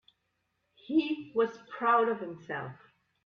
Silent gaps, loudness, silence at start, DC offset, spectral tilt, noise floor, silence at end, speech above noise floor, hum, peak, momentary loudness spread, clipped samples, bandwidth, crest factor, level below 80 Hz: none; -31 LUFS; 0.9 s; under 0.1%; -7 dB/octave; -79 dBFS; 0.5 s; 49 dB; none; -14 dBFS; 13 LU; under 0.1%; 6.6 kHz; 18 dB; -78 dBFS